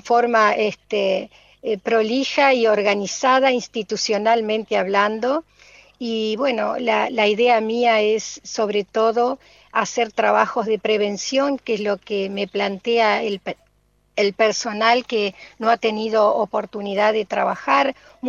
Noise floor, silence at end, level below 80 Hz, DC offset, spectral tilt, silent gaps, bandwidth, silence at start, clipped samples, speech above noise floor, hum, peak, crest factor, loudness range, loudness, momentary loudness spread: -62 dBFS; 0 s; -62 dBFS; under 0.1%; -3.5 dB/octave; none; 7.6 kHz; 0.05 s; under 0.1%; 42 dB; 50 Hz at -60 dBFS; -2 dBFS; 18 dB; 3 LU; -20 LUFS; 9 LU